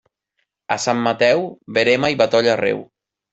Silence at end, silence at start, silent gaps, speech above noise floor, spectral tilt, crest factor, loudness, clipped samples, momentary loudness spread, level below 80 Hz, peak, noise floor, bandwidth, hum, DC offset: 0.5 s; 0.7 s; none; 55 dB; -4 dB/octave; 16 dB; -18 LUFS; under 0.1%; 7 LU; -60 dBFS; -2 dBFS; -73 dBFS; 8.2 kHz; none; under 0.1%